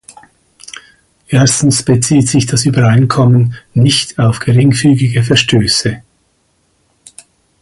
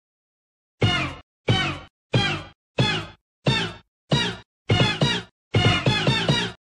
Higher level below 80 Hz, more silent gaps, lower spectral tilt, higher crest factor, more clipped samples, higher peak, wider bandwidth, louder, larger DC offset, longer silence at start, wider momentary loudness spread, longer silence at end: about the same, -40 dBFS vs -44 dBFS; second, none vs 1.23-1.44 s, 1.90-2.10 s, 2.55-2.75 s, 3.21-3.42 s, 3.88-4.08 s, 4.45-4.65 s, 5.31-5.51 s; about the same, -5 dB/octave vs -5 dB/octave; second, 12 dB vs 18 dB; neither; first, 0 dBFS vs -6 dBFS; about the same, 11.5 kHz vs 11 kHz; first, -10 LUFS vs -23 LUFS; neither; first, 1.3 s vs 0.8 s; about the same, 9 LU vs 11 LU; first, 1.65 s vs 0.05 s